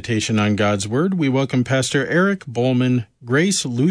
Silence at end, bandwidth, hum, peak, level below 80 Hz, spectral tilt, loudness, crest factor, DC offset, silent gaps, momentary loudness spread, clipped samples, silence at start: 0 s; 11 kHz; none; -6 dBFS; -56 dBFS; -5 dB/octave; -19 LUFS; 14 dB; under 0.1%; none; 3 LU; under 0.1%; 0 s